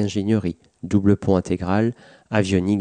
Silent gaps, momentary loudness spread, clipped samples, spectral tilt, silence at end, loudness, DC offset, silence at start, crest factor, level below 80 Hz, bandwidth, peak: none; 6 LU; under 0.1%; -7 dB/octave; 0 s; -21 LUFS; under 0.1%; 0 s; 16 dB; -48 dBFS; 9.6 kHz; -4 dBFS